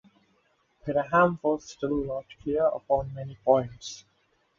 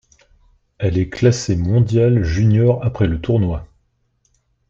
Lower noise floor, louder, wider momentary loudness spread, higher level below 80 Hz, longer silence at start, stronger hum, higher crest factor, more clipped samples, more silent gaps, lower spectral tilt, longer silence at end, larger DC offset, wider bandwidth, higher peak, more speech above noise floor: first, -69 dBFS vs -64 dBFS; second, -27 LUFS vs -17 LUFS; first, 16 LU vs 7 LU; second, -54 dBFS vs -36 dBFS; about the same, 0.85 s vs 0.8 s; neither; first, 20 dB vs 14 dB; neither; neither; second, -6 dB/octave vs -7.5 dB/octave; second, 0.6 s vs 1.05 s; neither; about the same, 7.6 kHz vs 7.8 kHz; second, -8 dBFS vs -2 dBFS; second, 43 dB vs 49 dB